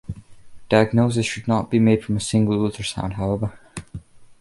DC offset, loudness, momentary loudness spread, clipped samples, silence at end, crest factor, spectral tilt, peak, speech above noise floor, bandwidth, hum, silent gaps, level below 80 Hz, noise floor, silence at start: under 0.1%; -21 LUFS; 20 LU; under 0.1%; 0.05 s; 18 dB; -6 dB/octave; -2 dBFS; 20 dB; 11.5 kHz; none; none; -44 dBFS; -39 dBFS; 0.1 s